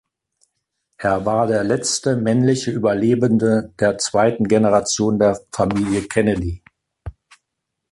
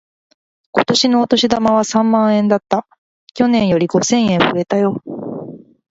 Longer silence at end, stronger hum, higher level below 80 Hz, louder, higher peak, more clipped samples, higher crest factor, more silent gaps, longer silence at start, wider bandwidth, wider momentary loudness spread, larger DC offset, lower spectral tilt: first, 0.8 s vs 0.35 s; neither; first, -42 dBFS vs -52 dBFS; second, -18 LUFS vs -15 LUFS; about the same, -2 dBFS vs 0 dBFS; neither; about the same, 16 dB vs 16 dB; second, none vs 2.98-3.27 s; first, 1 s vs 0.75 s; first, 11.5 kHz vs 8 kHz; second, 8 LU vs 13 LU; neither; about the same, -5 dB/octave vs -4.5 dB/octave